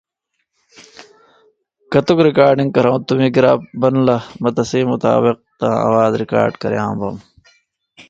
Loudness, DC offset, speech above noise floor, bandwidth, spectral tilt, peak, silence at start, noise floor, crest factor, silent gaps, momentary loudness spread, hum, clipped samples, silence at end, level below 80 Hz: -15 LUFS; under 0.1%; 58 dB; 7.8 kHz; -7 dB/octave; 0 dBFS; 0.8 s; -72 dBFS; 16 dB; none; 8 LU; none; under 0.1%; 0.1 s; -54 dBFS